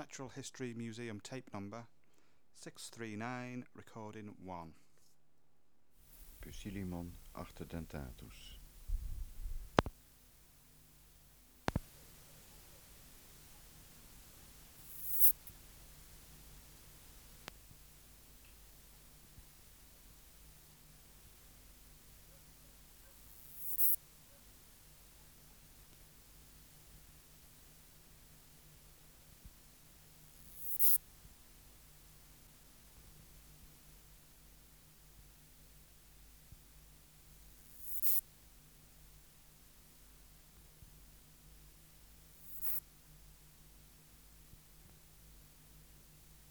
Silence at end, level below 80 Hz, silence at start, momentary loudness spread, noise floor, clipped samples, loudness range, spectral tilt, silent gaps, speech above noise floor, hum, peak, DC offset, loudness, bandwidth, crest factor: 0.05 s; -58 dBFS; 0 s; 24 LU; -79 dBFS; under 0.1%; 25 LU; -4 dB/octave; none; 32 dB; none; -8 dBFS; under 0.1%; -36 LUFS; over 20 kHz; 36 dB